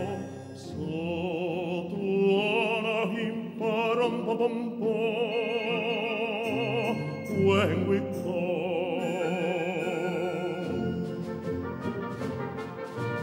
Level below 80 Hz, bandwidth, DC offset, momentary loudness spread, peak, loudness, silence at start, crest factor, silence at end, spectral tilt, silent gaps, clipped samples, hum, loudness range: -66 dBFS; 16 kHz; under 0.1%; 9 LU; -12 dBFS; -29 LUFS; 0 s; 18 dB; 0 s; -6.5 dB/octave; none; under 0.1%; none; 4 LU